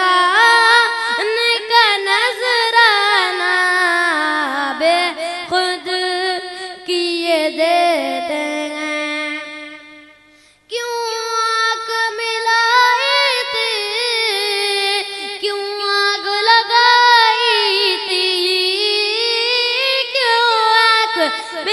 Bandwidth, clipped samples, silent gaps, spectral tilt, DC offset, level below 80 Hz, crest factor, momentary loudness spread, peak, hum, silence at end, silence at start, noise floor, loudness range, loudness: 12.5 kHz; under 0.1%; none; 0.5 dB/octave; under 0.1%; -68 dBFS; 16 dB; 10 LU; 0 dBFS; 50 Hz at -65 dBFS; 0 s; 0 s; -50 dBFS; 8 LU; -14 LUFS